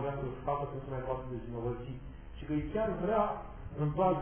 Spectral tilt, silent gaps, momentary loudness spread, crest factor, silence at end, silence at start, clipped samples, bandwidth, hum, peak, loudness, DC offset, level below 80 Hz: -7.5 dB/octave; none; 14 LU; 18 dB; 0 s; 0 s; under 0.1%; 3.5 kHz; none; -18 dBFS; -36 LUFS; under 0.1%; -48 dBFS